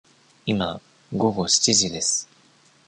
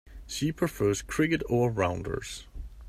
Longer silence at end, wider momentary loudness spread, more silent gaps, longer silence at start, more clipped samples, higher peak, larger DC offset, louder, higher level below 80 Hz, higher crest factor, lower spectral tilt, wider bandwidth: first, 0.65 s vs 0 s; first, 16 LU vs 13 LU; neither; first, 0.45 s vs 0.05 s; neither; first, -6 dBFS vs -12 dBFS; neither; first, -21 LUFS vs -29 LUFS; second, -54 dBFS vs -46 dBFS; about the same, 20 dB vs 18 dB; second, -2.5 dB/octave vs -5.5 dB/octave; second, 11 kHz vs 16 kHz